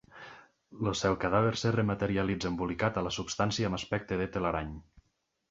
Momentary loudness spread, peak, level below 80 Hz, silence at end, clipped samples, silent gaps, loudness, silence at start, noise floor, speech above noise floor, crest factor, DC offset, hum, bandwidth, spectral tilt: 12 LU; -12 dBFS; -52 dBFS; 0.7 s; under 0.1%; none; -31 LUFS; 0.15 s; -78 dBFS; 47 dB; 20 dB; under 0.1%; none; 8 kHz; -5.5 dB/octave